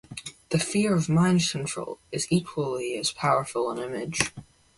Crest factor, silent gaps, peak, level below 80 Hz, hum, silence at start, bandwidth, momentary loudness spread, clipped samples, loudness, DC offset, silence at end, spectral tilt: 22 dB; none; -4 dBFS; -56 dBFS; none; 0.1 s; 11.5 kHz; 10 LU; under 0.1%; -26 LUFS; under 0.1%; 0.35 s; -4.5 dB/octave